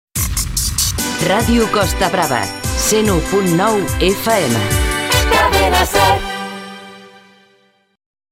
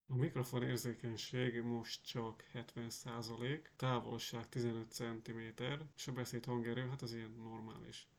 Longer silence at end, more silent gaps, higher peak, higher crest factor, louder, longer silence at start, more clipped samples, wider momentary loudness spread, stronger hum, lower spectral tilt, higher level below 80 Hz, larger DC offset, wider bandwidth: first, 1.25 s vs 0.15 s; neither; first, -2 dBFS vs -26 dBFS; about the same, 14 dB vs 18 dB; first, -15 LUFS vs -44 LUFS; about the same, 0.15 s vs 0.1 s; neither; second, 7 LU vs 10 LU; neither; second, -3.5 dB/octave vs -5.5 dB/octave; first, -26 dBFS vs -74 dBFS; neither; second, 16.5 kHz vs 19 kHz